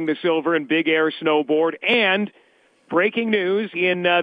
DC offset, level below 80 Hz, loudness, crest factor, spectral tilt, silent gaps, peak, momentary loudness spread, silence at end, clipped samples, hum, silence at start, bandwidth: under 0.1%; -76 dBFS; -20 LUFS; 16 dB; -7 dB/octave; none; -6 dBFS; 4 LU; 0 s; under 0.1%; none; 0 s; 5 kHz